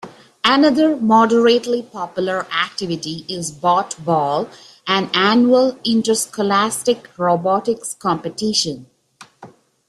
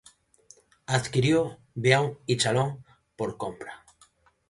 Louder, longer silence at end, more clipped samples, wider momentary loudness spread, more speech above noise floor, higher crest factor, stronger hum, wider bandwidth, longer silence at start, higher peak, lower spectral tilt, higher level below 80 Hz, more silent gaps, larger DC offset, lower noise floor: first, -17 LUFS vs -26 LUFS; second, 0.4 s vs 0.75 s; neither; second, 11 LU vs 19 LU; second, 30 dB vs 36 dB; second, 16 dB vs 24 dB; neither; first, 13.5 kHz vs 11.5 kHz; second, 0.05 s vs 0.9 s; about the same, -2 dBFS vs -4 dBFS; about the same, -4 dB/octave vs -5 dB/octave; about the same, -62 dBFS vs -60 dBFS; neither; neither; second, -47 dBFS vs -62 dBFS